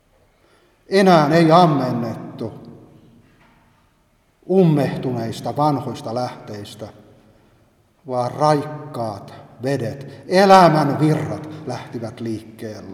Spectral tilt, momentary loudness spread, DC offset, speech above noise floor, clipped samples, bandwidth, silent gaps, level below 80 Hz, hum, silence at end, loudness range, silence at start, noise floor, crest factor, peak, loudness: -7 dB/octave; 20 LU; under 0.1%; 42 dB; under 0.1%; 14.5 kHz; none; -60 dBFS; none; 0 s; 8 LU; 0.9 s; -60 dBFS; 20 dB; 0 dBFS; -18 LUFS